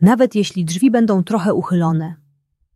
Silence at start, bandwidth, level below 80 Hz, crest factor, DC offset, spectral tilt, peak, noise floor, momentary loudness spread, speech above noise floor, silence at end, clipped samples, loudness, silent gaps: 0 s; 13 kHz; -60 dBFS; 14 dB; under 0.1%; -7 dB/octave; -2 dBFS; -62 dBFS; 6 LU; 47 dB; 0.6 s; under 0.1%; -16 LUFS; none